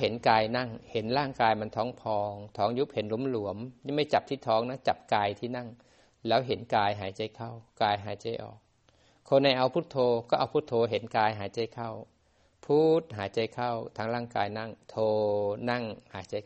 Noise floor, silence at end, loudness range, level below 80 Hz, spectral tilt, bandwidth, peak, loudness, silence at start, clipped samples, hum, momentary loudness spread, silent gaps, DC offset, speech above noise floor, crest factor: -67 dBFS; 0.05 s; 3 LU; -66 dBFS; -6.5 dB/octave; 8.4 kHz; -8 dBFS; -30 LUFS; 0 s; under 0.1%; none; 13 LU; none; under 0.1%; 37 dB; 22 dB